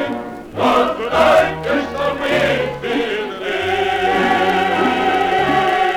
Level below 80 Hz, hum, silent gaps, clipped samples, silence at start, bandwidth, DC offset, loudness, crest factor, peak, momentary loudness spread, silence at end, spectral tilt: -44 dBFS; none; none; under 0.1%; 0 s; 19 kHz; under 0.1%; -16 LUFS; 14 dB; -2 dBFS; 7 LU; 0 s; -5 dB/octave